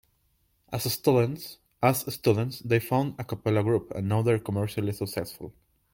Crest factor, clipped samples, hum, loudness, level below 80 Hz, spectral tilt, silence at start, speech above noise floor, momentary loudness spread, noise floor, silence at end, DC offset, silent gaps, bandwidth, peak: 20 dB; under 0.1%; none; -27 LUFS; -60 dBFS; -6 dB/octave; 0.7 s; 43 dB; 12 LU; -70 dBFS; 0.45 s; under 0.1%; none; 17 kHz; -8 dBFS